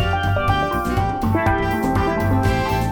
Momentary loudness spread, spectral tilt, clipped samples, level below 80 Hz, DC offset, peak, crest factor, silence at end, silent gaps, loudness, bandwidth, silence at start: 2 LU; -6.5 dB/octave; under 0.1%; -30 dBFS; under 0.1%; -6 dBFS; 14 dB; 0 s; none; -20 LUFS; 19.5 kHz; 0 s